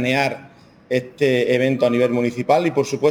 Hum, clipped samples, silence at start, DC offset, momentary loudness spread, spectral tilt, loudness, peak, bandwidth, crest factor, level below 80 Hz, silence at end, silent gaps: none; under 0.1%; 0 s; under 0.1%; 7 LU; -6 dB/octave; -19 LUFS; -4 dBFS; 18.5 kHz; 16 dB; -62 dBFS; 0 s; none